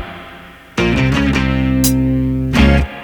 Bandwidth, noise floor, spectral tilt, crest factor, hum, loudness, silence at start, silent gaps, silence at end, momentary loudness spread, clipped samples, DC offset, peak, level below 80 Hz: over 20 kHz; -37 dBFS; -5.5 dB/octave; 14 dB; none; -14 LUFS; 0 s; none; 0 s; 15 LU; under 0.1%; under 0.1%; 0 dBFS; -22 dBFS